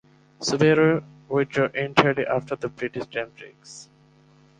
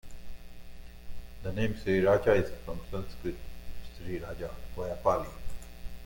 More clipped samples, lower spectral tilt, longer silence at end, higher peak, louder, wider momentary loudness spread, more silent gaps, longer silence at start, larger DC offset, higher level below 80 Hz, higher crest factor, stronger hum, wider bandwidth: neither; second, -5.5 dB/octave vs -7 dB/octave; first, 0.75 s vs 0 s; first, -2 dBFS vs -12 dBFS; first, -23 LUFS vs -32 LUFS; second, 21 LU vs 26 LU; neither; first, 0.4 s vs 0.05 s; neither; second, -60 dBFS vs -44 dBFS; about the same, 22 dB vs 20 dB; neither; second, 9.6 kHz vs 17 kHz